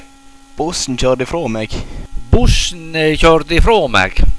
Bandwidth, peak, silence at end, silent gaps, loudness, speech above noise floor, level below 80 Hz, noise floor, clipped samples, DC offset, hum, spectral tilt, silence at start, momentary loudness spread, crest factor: 11 kHz; 0 dBFS; 0 s; none; -14 LUFS; 28 dB; -18 dBFS; -40 dBFS; under 0.1%; under 0.1%; none; -4.5 dB/octave; 0.55 s; 12 LU; 12 dB